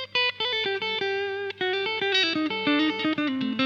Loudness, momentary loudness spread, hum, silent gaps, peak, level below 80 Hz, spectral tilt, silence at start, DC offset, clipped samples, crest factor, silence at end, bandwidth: -25 LUFS; 5 LU; 50 Hz at -55 dBFS; none; -12 dBFS; -74 dBFS; -4 dB/octave; 0 s; under 0.1%; under 0.1%; 14 dB; 0 s; 7.4 kHz